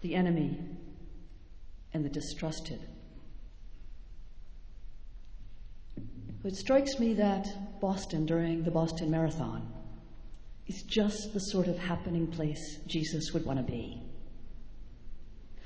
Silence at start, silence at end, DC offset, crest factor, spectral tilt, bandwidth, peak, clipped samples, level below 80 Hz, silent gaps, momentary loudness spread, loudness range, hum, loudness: 0 s; 0 s; under 0.1%; 20 dB; -6 dB/octave; 8 kHz; -14 dBFS; under 0.1%; -48 dBFS; none; 25 LU; 14 LU; none; -33 LUFS